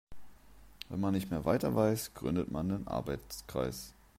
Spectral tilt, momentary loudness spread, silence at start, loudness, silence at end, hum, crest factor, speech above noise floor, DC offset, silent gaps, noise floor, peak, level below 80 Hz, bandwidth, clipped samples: -6.5 dB/octave; 11 LU; 0.1 s; -35 LUFS; 0.3 s; none; 20 dB; 23 dB; under 0.1%; none; -57 dBFS; -16 dBFS; -54 dBFS; 16 kHz; under 0.1%